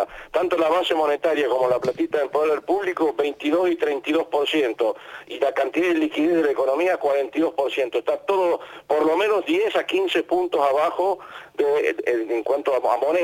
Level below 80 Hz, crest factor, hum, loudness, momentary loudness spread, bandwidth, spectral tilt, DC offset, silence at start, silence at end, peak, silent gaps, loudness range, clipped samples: -64 dBFS; 14 dB; none; -22 LUFS; 4 LU; 17 kHz; -4.5 dB/octave; under 0.1%; 0 s; 0 s; -8 dBFS; none; 1 LU; under 0.1%